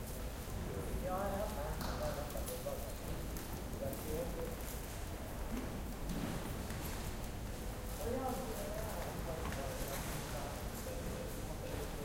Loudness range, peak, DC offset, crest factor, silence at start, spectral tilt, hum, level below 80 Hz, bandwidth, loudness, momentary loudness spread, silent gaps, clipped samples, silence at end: 2 LU; -26 dBFS; under 0.1%; 16 dB; 0 s; -5 dB/octave; none; -46 dBFS; 17 kHz; -43 LUFS; 5 LU; none; under 0.1%; 0 s